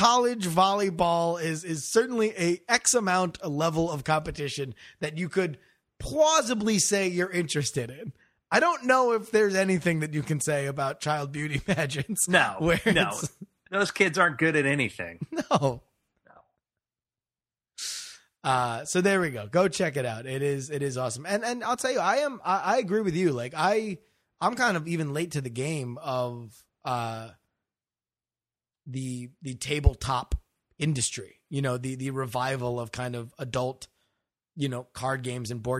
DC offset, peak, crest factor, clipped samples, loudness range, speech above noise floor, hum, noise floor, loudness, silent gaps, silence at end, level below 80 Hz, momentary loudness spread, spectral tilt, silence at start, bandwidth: under 0.1%; -4 dBFS; 24 dB; under 0.1%; 8 LU; over 63 dB; none; under -90 dBFS; -27 LUFS; none; 0 s; -46 dBFS; 13 LU; -4 dB/octave; 0 s; 15.5 kHz